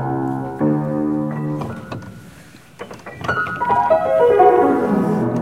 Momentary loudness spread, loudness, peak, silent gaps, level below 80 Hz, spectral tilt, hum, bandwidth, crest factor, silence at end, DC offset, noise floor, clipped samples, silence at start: 21 LU; -17 LUFS; 0 dBFS; none; -50 dBFS; -8 dB/octave; none; 15.5 kHz; 18 dB; 0 s; 0.2%; -43 dBFS; under 0.1%; 0 s